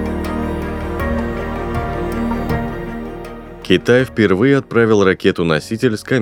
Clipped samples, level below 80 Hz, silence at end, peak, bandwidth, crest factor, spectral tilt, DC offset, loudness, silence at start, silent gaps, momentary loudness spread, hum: under 0.1%; -30 dBFS; 0 s; 0 dBFS; 18 kHz; 16 dB; -6.5 dB/octave; under 0.1%; -17 LUFS; 0 s; none; 13 LU; none